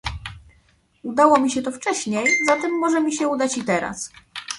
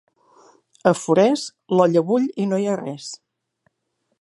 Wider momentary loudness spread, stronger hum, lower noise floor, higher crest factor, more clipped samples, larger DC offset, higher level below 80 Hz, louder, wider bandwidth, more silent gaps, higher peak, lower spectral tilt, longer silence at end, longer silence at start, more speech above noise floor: about the same, 17 LU vs 15 LU; neither; second, -59 dBFS vs -73 dBFS; about the same, 20 dB vs 20 dB; neither; neither; first, -48 dBFS vs -70 dBFS; about the same, -20 LUFS vs -20 LUFS; about the same, 11.5 kHz vs 11.5 kHz; neither; about the same, -2 dBFS vs -2 dBFS; second, -3.5 dB/octave vs -6 dB/octave; second, 0 s vs 1.05 s; second, 0.05 s vs 0.85 s; second, 39 dB vs 54 dB